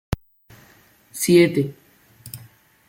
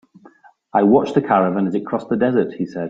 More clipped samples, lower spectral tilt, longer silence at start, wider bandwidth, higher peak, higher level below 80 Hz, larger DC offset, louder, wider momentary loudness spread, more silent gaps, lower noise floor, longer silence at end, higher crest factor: neither; second, -5.5 dB/octave vs -8.5 dB/octave; second, 0.1 s vs 0.75 s; first, 17 kHz vs 7.8 kHz; about the same, -4 dBFS vs -2 dBFS; first, -44 dBFS vs -58 dBFS; neither; about the same, -19 LUFS vs -18 LUFS; first, 23 LU vs 8 LU; neither; first, -54 dBFS vs -49 dBFS; first, 0.5 s vs 0 s; about the same, 20 dB vs 16 dB